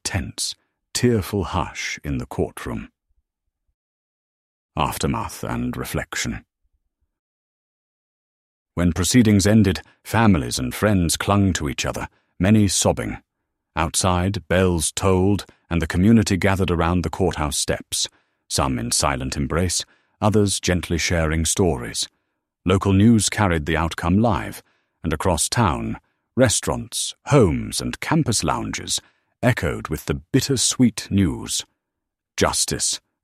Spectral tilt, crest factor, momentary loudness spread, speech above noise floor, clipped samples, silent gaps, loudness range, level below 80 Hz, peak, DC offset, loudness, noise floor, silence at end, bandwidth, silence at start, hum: -4.5 dB/octave; 20 dB; 11 LU; 62 dB; under 0.1%; 3.74-4.69 s, 7.19-8.66 s; 9 LU; -38 dBFS; -2 dBFS; under 0.1%; -21 LUFS; -82 dBFS; 0.25 s; 15.5 kHz; 0.05 s; none